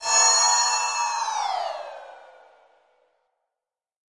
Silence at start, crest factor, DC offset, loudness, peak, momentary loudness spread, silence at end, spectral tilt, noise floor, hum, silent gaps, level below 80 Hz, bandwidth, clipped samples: 0 s; 18 dB; under 0.1%; -20 LUFS; -8 dBFS; 20 LU; 1.9 s; 4.5 dB/octave; -89 dBFS; none; none; -76 dBFS; 11.5 kHz; under 0.1%